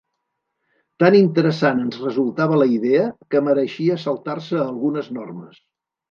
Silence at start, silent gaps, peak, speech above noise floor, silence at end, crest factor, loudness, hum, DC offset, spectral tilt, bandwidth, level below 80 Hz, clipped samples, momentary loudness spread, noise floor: 1 s; none; -2 dBFS; 58 dB; 0.65 s; 18 dB; -19 LUFS; none; under 0.1%; -8 dB/octave; 7 kHz; -70 dBFS; under 0.1%; 12 LU; -77 dBFS